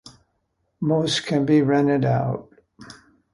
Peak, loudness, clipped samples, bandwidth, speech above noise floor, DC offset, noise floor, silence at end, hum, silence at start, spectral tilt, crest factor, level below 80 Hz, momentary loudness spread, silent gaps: -6 dBFS; -21 LUFS; under 0.1%; 11.5 kHz; 52 dB; under 0.1%; -72 dBFS; 0.4 s; none; 0.05 s; -6 dB/octave; 16 dB; -58 dBFS; 10 LU; none